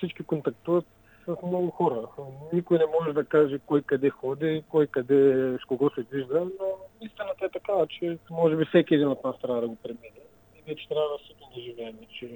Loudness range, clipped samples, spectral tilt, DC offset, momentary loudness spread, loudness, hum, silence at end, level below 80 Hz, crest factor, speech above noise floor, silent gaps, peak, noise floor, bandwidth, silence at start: 4 LU; under 0.1%; -8.5 dB/octave; under 0.1%; 18 LU; -27 LUFS; none; 0 s; -68 dBFS; 20 dB; 27 dB; none; -8 dBFS; -54 dBFS; 18 kHz; 0 s